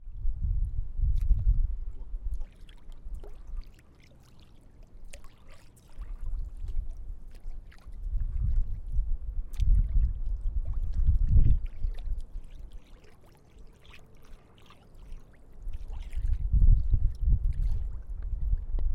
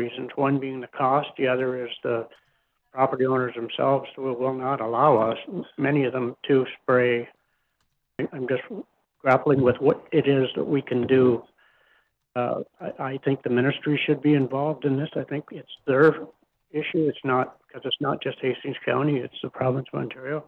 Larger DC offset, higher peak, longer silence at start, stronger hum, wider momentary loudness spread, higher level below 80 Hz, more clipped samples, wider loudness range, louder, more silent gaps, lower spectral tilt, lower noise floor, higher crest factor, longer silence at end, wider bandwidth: neither; second, -12 dBFS vs -6 dBFS; about the same, 0 s vs 0 s; neither; first, 23 LU vs 13 LU; first, -30 dBFS vs -68 dBFS; neither; first, 19 LU vs 4 LU; second, -33 LUFS vs -24 LUFS; neither; about the same, -8 dB/octave vs -9 dB/octave; second, -54 dBFS vs -73 dBFS; about the same, 16 dB vs 18 dB; about the same, 0 s vs 0.05 s; second, 3.6 kHz vs 4.8 kHz